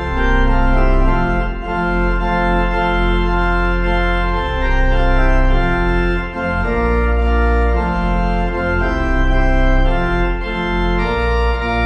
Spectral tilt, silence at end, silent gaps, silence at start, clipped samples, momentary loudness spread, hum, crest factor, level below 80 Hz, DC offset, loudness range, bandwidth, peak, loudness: -7.5 dB/octave; 0 s; none; 0 s; under 0.1%; 3 LU; none; 12 dB; -16 dBFS; under 0.1%; 1 LU; 6.6 kHz; -2 dBFS; -17 LUFS